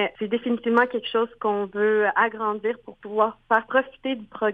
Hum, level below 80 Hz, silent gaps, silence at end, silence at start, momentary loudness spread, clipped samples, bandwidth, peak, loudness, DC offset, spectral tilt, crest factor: none; -64 dBFS; none; 0 s; 0 s; 9 LU; under 0.1%; 4.8 kHz; -6 dBFS; -24 LUFS; under 0.1%; -7 dB/octave; 18 dB